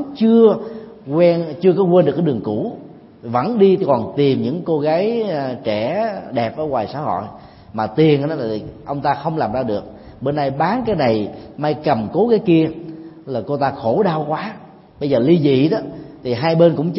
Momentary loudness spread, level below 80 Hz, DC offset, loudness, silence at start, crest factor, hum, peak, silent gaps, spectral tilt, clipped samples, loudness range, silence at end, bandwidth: 14 LU; -52 dBFS; under 0.1%; -18 LUFS; 0 s; 16 dB; none; 0 dBFS; none; -12 dB/octave; under 0.1%; 4 LU; 0 s; 5.8 kHz